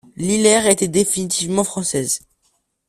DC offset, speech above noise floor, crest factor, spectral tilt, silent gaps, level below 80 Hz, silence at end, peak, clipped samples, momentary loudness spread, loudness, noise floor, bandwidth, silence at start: under 0.1%; 48 dB; 18 dB; -3.5 dB/octave; none; -52 dBFS; 0.7 s; 0 dBFS; under 0.1%; 7 LU; -17 LUFS; -66 dBFS; 15.5 kHz; 0.15 s